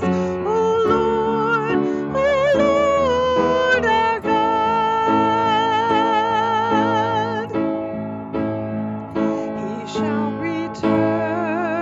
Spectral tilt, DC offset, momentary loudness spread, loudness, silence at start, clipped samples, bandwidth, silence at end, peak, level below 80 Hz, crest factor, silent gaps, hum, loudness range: -6 dB/octave; under 0.1%; 8 LU; -19 LUFS; 0 s; under 0.1%; 7.8 kHz; 0 s; -4 dBFS; -48 dBFS; 14 dB; none; none; 6 LU